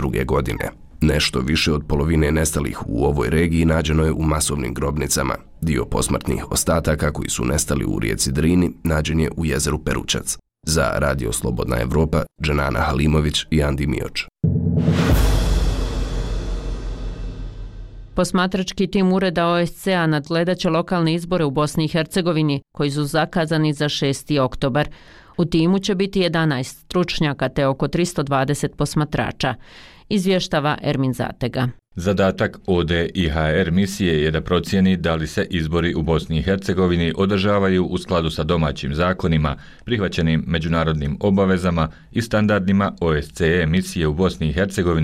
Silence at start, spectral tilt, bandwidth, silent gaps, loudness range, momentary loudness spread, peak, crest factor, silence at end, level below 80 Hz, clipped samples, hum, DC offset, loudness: 0 s; -5.5 dB/octave; 16 kHz; none; 2 LU; 7 LU; -8 dBFS; 12 dB; 0 s; -30 dBFS; under 0.1%; none; under 0.1%; -20 LUFS